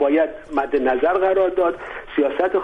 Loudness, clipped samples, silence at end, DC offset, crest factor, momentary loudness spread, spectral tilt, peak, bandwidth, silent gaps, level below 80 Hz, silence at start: -20 LUFS; under 0.1%; 0 s; under 0.1%; 12 dB; 7 LU; -6.5 dB/octave; -8 dBFS; 5.6 kHz; none; -48 dBFS; 0 s